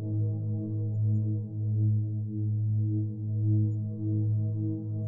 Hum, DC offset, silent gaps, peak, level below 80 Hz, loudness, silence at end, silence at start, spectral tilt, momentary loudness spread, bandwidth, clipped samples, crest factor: none; under 0.1%; none; -18 dBFS; -68 dBFS; -30 LUFS; 0 s; 0 s; -15.5 dB/octave; 5 LU; 0.9 kHz; under 0.1%; 10 dB